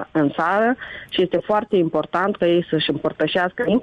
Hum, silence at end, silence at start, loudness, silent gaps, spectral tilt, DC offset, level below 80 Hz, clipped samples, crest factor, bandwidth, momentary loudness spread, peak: none; 0 s; 0 s; -20 LUFS; none; -7.5 dB/octave; under 0.1%; -56 dBFS; under 0.1%; 12 dB; 7.6 kHz; 4 LU; -8 dBFS